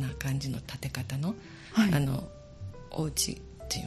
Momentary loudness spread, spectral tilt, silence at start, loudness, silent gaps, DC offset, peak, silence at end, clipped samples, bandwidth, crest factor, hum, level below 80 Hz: 18 LU; -4.5 dB/octave; 0 s; -31 LUFS; none; under 0.1%; -12 dBFS; 0 s; under 0.1%; 13.5 kHz; 20 dB; none; -48 dBFS